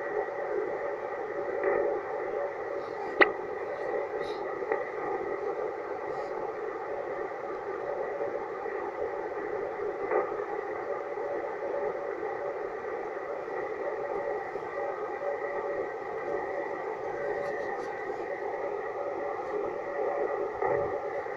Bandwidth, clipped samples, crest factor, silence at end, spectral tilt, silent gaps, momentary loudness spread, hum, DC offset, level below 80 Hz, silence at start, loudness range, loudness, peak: 7.6 kHz; under 0.1%; 28 dB; 0 s; -6 dB/octave; none; 6 LU; none; under 0.1%; -66 dBFS; 0 s; 4 LU; -33 LUFS; -6 dBFS